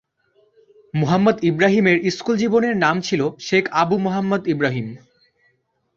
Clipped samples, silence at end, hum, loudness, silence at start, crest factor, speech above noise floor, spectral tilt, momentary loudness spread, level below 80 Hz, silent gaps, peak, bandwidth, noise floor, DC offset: under 0.1%; 1 s; none; -19 LUFS; 0.95 s; 18 dB; 47 dB; -6 dB/octave; 6 LU; -58 dBFS; none; -2 dBFS; 7.6 kHz; -66 dBFS; under 0.1%